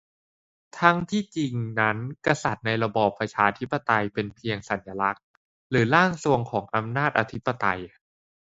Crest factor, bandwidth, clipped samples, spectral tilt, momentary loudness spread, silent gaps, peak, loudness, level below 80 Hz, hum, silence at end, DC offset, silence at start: 26 dB; 8 kHz; under 0.1%; -6 dB/octave; 9 LU; 5.23-5.70 s; 0 dBFS; -25 LUFS; -58 dBFS; none; 0.6 s; under 0.1%; 0.75 s